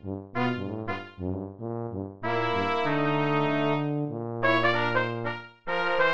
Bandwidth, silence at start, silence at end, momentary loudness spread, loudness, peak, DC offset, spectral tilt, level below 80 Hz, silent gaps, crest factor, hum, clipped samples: 7.8 kHz; 0 s; 0 s; 11 LU; -28 LUFS; -10 dBFS; 0.5%; -7.5 dB/octave; -60 dBFS; none; 18 dB; none; under 0.1%